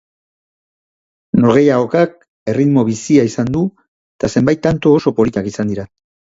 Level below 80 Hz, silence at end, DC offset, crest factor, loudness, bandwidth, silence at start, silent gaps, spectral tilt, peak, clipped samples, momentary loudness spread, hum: -46 dBFS; 0.5 s; under 0.1%; 16 dB; -14 LUFS; 7.8 kHz; 1.35 s; 2.28-2.46 s, 3.88-4.19 s; -7 dB/octave; 0 dBFS; under 0.1%; 10 LU; none